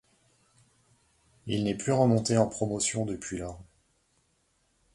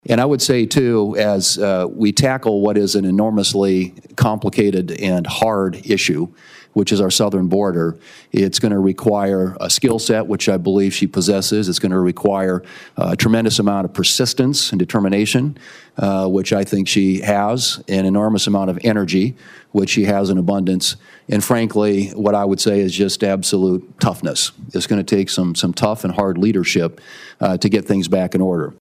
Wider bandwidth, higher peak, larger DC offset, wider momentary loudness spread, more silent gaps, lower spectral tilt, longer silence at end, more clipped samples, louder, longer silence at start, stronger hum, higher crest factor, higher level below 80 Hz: second, 11.5 kHz vs 16 kHz; second, -10 dBFS vs -2 dBFS; neither; first, 16 LU vs 5 LU; neither; about the same, -5 dB/octave vs -4.5 dB/octave; first, 1.3 s vs 0.05 s; neither; second, -28 LUFS vs -17 LUFS; first, 1.45 s vs 0.1 s; neither; first, 22 dB vs 14 dB; second, -58 dBFS vs -52 dBFS